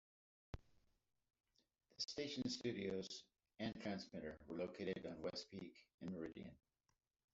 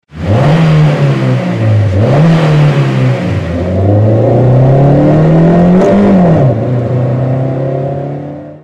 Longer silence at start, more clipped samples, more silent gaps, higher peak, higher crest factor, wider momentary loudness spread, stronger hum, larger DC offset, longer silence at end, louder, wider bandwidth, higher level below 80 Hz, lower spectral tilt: first, 0.55 s vs 0.15 s; neither; first, 5.94-5.98 s vs none; second, -30 dBFS vs 0 dBFS; first, 20 dB vs 8 dB; first, 15 LU vs 8 LU; neither; neither; first, 0.75 s vs 0.05 s; second, -49 LUFS vs -9 LUFS; about the same, 8 kHz vs 8.4 kHz; second, -72 dBFS vs -32 dBFS; second, -4.5 dB/octave vs -9 dB/octave